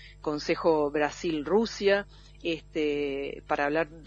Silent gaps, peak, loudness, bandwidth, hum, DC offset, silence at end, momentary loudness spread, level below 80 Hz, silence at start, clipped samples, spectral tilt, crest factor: none; -12 dBFS; -28 LUFS; 8 kHz; none; under 0.1%; 0 s; 9 LU; -52 dBFS; 0 s; under 0.1%; -5 dB/octave; 18 dB